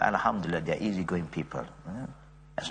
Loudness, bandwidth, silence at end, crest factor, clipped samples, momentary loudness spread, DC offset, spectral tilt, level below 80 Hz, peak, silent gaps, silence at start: -32 LUFS; 9.6 kHz; 0 s; 22 dB; under 0.1%; 13 LU; under 0.1%; -6 dB/octave; -56 dBFS; -10 dBFS; none; 0 s